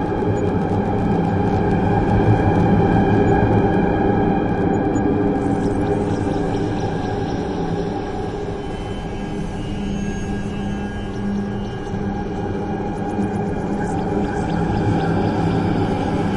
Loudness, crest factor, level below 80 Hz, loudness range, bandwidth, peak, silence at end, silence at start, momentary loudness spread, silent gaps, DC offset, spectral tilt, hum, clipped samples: -20 LUFS; 16 dB; -32 dBFS; 8 LU; 10.5 kHz; -4 dBFS; 0 s; 0 s; 10 LU; none; under 0.1%; -8 dB/octave; none; under 0.1%